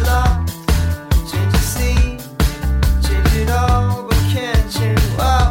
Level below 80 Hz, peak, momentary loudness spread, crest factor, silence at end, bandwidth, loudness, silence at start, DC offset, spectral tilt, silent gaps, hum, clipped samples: -18 dBFS; -4 dBFS; 4 LU; 10 dB; 0 s; 17 kHz; -17 LUFS; 0 s; under 0.1%; -5.5 dB/octave; none; none; under 0.1%